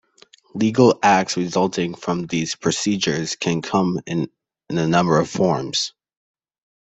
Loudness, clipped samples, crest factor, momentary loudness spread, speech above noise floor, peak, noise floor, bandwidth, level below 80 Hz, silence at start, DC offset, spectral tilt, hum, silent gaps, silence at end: -20 LUFS; under 0.1%; 18 dB; 10 LU; 33 dB; -2 dBFS; -53 dBFS; 8.4 kHz; -58 dBFS; 0.55 s; under 0.1%; -5 dB/octave; none; none; 0.95 s